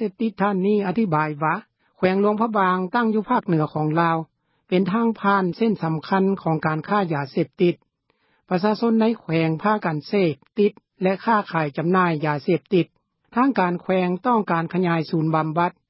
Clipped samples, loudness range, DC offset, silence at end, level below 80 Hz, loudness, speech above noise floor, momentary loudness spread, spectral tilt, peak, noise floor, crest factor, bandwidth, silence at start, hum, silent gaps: under 0.1%; 1 LU; under 0.1%; 0.2 s; -66 dBFS; -22 LUFS; 46 dB; 5 LU; -12 dB/octave; -6 dBFS; -67 dBFS; 16 dB; 5.8 kHz; 0 s; none; none